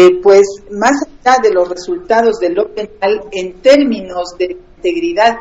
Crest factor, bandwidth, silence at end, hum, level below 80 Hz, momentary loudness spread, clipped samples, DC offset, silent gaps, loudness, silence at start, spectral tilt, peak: 12 dB; 8 kHz; 0 s; none; -44 dBFS; 11 LU; 0.4%; under 0.1%; none; -13 LUFS; 0 s; -4 dB/octave; 0 dBFS